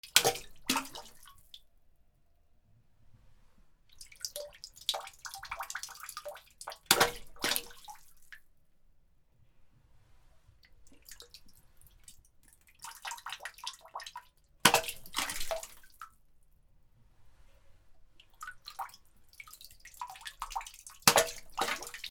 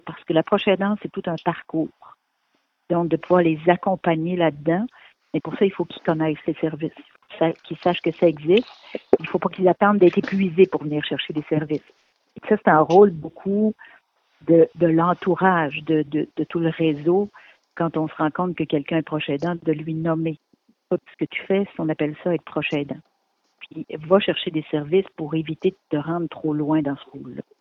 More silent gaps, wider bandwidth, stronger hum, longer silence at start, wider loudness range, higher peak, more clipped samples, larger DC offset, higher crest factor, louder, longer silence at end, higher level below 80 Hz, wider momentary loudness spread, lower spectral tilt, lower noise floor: neither; first, over 20 kHz vs 6.4 kHz; neither; about the same, 0.05 s vs 0.05 s; first, 18 LU vs 6 LU; about the same, 0 dBFS vs 0 dBFS; neither; neither; first, 38 dB vs 22 dB; second, -33 LUFS vs -22 LUFS; second, 0 s vs 0.2 s; about the same, -60 dBFS vs -62 dBFS; first, 27 LU vs 12 LU; second, -1 dB/octave vs -8.5 dB/octave; second, -66 dBFS vs -70 dBFS